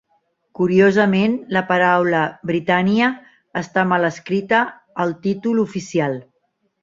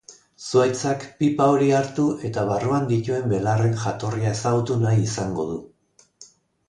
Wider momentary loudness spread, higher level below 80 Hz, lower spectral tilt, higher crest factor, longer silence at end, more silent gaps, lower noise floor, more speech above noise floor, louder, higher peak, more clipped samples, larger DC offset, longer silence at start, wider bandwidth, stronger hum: about the same, 10 LU vs 8 LU; second, -60 dBFS vs -54 dBFS; about the same, -6.5 dB/octave vs -6.5 dB/octave; about the same, 18 dB vs 16 dB; first, 0.6 s vs 0.45 s; neither; first, -68 dBFS vs -60 dBFS; first, 50 dB vs 39 dB; first, -18 LUFS vs -22 LUFS; first, -2 dBFS vs -6 dBFS; neither; neither; first, 0.6 s vs 0.1 s; second, 7.6 kHz vs 10.5 kHz; neither